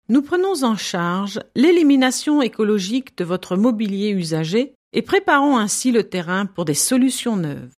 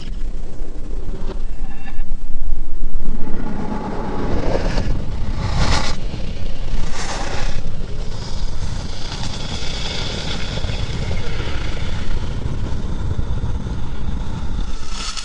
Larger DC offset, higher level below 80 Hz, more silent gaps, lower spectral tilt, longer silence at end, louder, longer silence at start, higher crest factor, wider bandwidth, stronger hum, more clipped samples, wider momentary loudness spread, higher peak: neither; second, -62 dBFS vs -22 dBFS; first, 4.75-4.91 s vs none; about the same, -4.5 dB/octave vs -5 dB/octave; about the same, 0.1 s vs 0 s; first, -19 LUFS vs -26 LUFS; about the same, 0.1 s vs 0 s; about the same, 14 dB vs 14 dB; first, 15 kHz vs 8.4 kHz; neither; neither; about the same, 9 LU vs 9 LU; second, -4 dBFS vs 0 dBFS